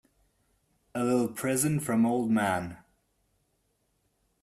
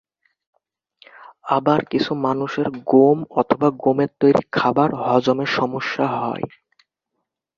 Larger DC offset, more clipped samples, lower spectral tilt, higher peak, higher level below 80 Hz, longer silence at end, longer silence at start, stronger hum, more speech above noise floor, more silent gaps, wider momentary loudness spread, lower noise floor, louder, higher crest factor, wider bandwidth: neither; neither; second, -5.5 dB/octave vs -7 dB/octave; second, -14 dBFS vs -2 dBFS; second, -66 dBFS vs -60 dBFS; first, 1.65 s vs 1.1 s; second, 0.95 s vs 1.2 s; neither; second, 47 dB vs 59 dB; neither; about the same, 8 LU vs 8 LU; second, -74 dBFS vs -78 dBFS; second, -28 LUFS vs -19 LUFS; about the same, 16 dB vs 18 dB; first, 14.5 kHz vs 7.2 kHz